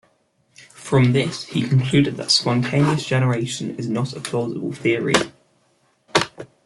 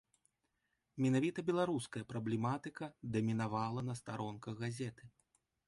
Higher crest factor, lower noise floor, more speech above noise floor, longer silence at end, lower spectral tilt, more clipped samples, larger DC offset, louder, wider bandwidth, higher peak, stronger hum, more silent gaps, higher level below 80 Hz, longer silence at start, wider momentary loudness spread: about the same, 20 dB vs 16 dB; second, -63 dBFS vs -84 dBFS; about the same, 44 dB vs 46 dB; second, 0.2 s vs 0.6 s; second, -5 dB/octave vs -6.5 dB/octave; neither; neither; first, -20 LUFS vs -39 LUFS; about the same, 12 kHz vs 11.5 kHz; first, -2 dBFS vs -24 dBFS; neither; neither; first, -56 dBFS vs -72 dBFS; second, 0.6 s vs 0.95 s; about the same, 9 LU vs 10 LU